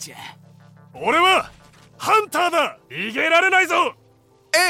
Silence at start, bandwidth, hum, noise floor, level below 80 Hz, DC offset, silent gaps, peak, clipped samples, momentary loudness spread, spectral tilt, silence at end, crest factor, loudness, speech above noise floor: 0 s; 16.5 kHz; none; -55 dBFS; -60 dBFS; under 0.1%; none; -4 dBFS; under 0.1%; 18 LU; -2 dB/octave; 0 s; 18 dB; -18 LUFS; 36 dB